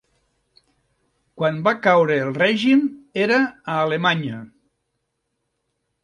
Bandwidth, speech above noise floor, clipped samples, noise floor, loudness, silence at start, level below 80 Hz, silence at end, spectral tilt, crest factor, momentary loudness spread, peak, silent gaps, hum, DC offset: 10 kHz; 56 dB; under 0.1%; -75 dBFS; -19 LUFS; 1.35 s; -66 dBFS; 1.6 s; -6.5 dB/octave; 20 dB; 8 LU; -2 dBFS; none; none; under 0.1%